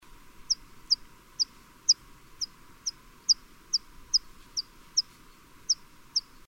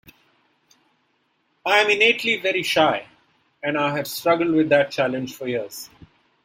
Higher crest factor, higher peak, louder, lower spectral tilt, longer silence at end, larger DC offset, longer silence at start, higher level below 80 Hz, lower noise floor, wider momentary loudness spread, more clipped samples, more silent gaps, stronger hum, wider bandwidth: about the same, 22 dB vs 20 dB; second, -10 dBFS vs -2 dBFS; second, -29 LUFS vs -20 LUFS; second, 2 dB/octave vs -4 dB/octave; second, 0.3 s vs 0.6 s; neither; second, 0.4 s vs 1.65 s; first, -58 dBFS vs -64 dBFS; second, -54 dBFS vs -68 dBFS; about the same, 11 LU vs 13 LU; neither; neither; neither; about the same, 16 kHz vs 16.5 kHz